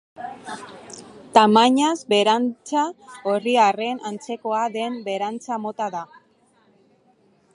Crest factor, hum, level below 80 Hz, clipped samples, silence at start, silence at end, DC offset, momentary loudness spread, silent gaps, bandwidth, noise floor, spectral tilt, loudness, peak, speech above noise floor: 22 dB; none; -72 dBFS; under 0.1%; 0.2 s; 1.5 s; under 0.1%; 21 LU; none; 11 kHz; -60 dBFS; -4 dB/octave; -21 LUFS; 0 dBFS; 39 dB